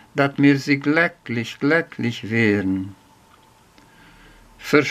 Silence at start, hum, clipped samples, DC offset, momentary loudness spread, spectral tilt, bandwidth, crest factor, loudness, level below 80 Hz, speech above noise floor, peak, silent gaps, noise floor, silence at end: 0.15 s; none; under 0.1%; under 0.1%; 11 LU; -6.5 dB/octave; 14.5 kHz; 20 dB; -20 LUFS; -60 dBFS; 33 dB; -2 dBFS; none; -53 dBFS; 0 s